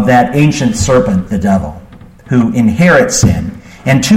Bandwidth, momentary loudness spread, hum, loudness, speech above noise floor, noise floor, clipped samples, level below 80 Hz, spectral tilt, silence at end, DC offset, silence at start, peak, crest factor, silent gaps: 16 kHz; 9 LU; none; -11 LUFS; 26 dB; -35 dBFS; under 0.1%; -30 dBFS; -5.5 dB/octave; 0 s; under 0.1%; 0 s; 0 dBFS; 10 dB; none